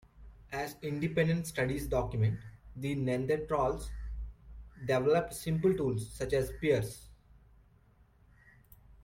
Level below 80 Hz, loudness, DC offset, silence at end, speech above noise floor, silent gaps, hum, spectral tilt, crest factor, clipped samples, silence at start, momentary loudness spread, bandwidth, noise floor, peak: -48 dBFS; -33 LUFS; under 0.1%; 1.9 s; 32 dB; none; none; -6.5 dB/octave; 18 dB; under 0.1%; 0.15 s; 14 LU; 16.5 kHz; -64 dBFS; -16 dBFS